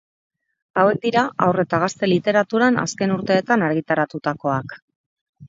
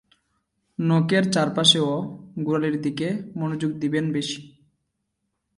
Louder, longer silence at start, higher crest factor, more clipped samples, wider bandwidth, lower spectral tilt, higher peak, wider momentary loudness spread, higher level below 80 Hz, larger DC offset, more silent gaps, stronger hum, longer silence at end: first, -20 LUFS vs -23 LUFS; about the same, 0.75 s vs 0.8 s; about the same, 18 dB vs 22 dB; neither; second, 7.8 kHz vs 11.5 kHz; about the same, -5.5 dB/octave vs -5 dB/octave; about the same, -2 dBFS vs -4 dBFS; second, 6 LU vs 14 LU; about the same, -60 dBFS vs -64 dBFS; neither; first, 4.82-4.88 s, 4.96-5.33 s vs none; neither; second, 0 s vs 1.1 s